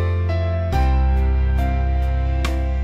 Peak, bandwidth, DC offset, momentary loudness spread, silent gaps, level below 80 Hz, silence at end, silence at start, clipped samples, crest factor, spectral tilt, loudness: -6 dBFS; 7.6 kHz; under 0.1%; 3 LU; none; -20 dBFS; 0 s; 0 s; under 0.1%; 10 dB; -7.5 dB/octave; -20 LUFS